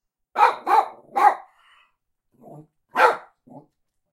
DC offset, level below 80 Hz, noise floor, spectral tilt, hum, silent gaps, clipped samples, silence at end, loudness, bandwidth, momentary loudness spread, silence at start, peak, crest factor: under 0.1%; -76 dBFS; -70 dBFS; -3 dB/octave; none; none; under 0.1%; 0.55 s; -20 LUFS; 16 kHz; 14 LU; 0.35 s; -2 dBFS; 22 dB